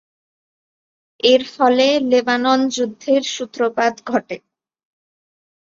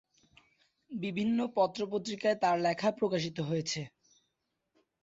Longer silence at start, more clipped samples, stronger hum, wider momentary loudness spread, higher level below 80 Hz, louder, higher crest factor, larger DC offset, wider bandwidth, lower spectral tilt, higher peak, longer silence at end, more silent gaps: first, 1.25 s vs 0.9 s; neither; neither; about the same, 8 LU vs 10 LU; first, -66 dBFS vs -72 dBFS; first, -17 LUFS vs -32 LUFS; about the same, 18 dB vs 18 dB; neither; about the same, 7.6 kHz vs 7.8 kHz; second, -3 dB/octave vs -5 dB/octave; first, -2 dBFS vs -16 dBFS; first, 1.4 s vs 1.15 s; neither